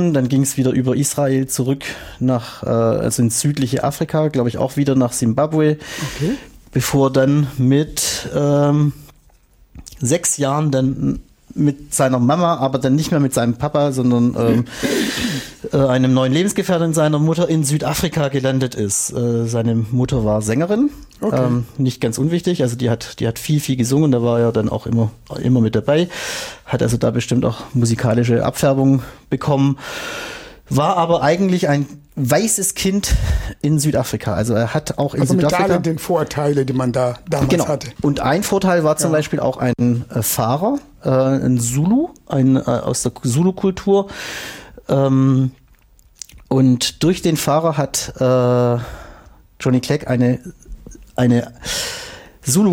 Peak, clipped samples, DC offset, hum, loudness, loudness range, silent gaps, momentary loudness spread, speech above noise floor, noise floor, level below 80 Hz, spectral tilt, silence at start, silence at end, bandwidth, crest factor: -4 dBFS; under 0.1%; under 0.1%; none; -17 LUFS; 2 LU; none; 8 LU; 34 dB; -51 dBFS; -38 dBFS; -5.5 dB/octave; 0 s; 0 s; 17 kHz; 14 dB